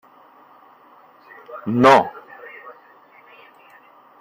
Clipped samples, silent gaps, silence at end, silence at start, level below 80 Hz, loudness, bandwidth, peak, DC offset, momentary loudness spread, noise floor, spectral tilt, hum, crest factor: under 0.1%; none; 1.5 s; 1.5 s; -64 dBFS; -16 LUFS; 16 kHz; -2 dBFS; under 0.1%; 26 LU; -50 dBFS; -6 dB/octave; none; 22 dB